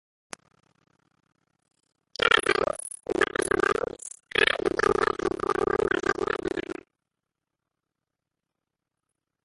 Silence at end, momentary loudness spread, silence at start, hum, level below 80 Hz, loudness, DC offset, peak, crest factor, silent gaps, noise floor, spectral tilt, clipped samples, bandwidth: 2.7 s; 20 LU; 2.2 s; none; -54 dBFS; -25 LUFS; under 0.1%; -4 dBFS; 24 dB; none; -86 dBFS; -3 dB/octave; under 0.1%; 11.5 kHz